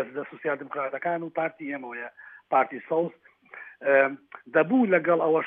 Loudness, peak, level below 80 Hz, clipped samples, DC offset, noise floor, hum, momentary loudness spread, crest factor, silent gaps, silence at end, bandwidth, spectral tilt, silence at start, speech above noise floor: -26 LUFS; -8 dBFS; -88 dBFS; under 0.1%; under 0.1%; -47 dBFS; none; 16 LU; 18 dB; none; 0 s; 3.7 kHz; -9.5 dB/octave; 0 s; 21 dB